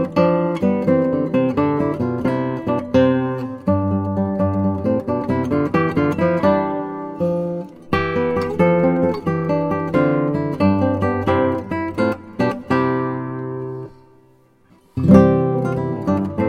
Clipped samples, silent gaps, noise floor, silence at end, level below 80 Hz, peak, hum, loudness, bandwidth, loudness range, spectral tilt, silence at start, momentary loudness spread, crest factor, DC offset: under 0.1%; none; -53 dBFS; 0 s; -48 dBFS; 0 dBFS; none; -19 LUFS; 9.8 kHz; 2 LU; -9 dB/octave; 0 s; 8 LU; 18 dB; under 0.1%